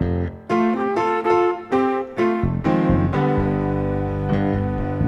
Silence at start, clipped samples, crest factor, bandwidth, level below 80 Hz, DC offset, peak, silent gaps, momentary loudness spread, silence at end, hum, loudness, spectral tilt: 0 s; under 0.1%; 14 dB; 8.2 kHz; -36 dBFS; under 0.1%; -6 dBFS; none; 5 LU; 0 s; none; -21 LUFS; -9 dB/octave